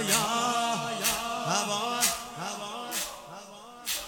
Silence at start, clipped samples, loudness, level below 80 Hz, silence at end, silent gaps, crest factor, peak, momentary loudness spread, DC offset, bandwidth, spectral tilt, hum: 0 s; under 0.1%; -29 LUFS; -60 dBFS; 0 s; none; 22 dB; -10 dBFS; 15 LU; under 0.1%; over 20 kHz; -1.5 dB/octave; none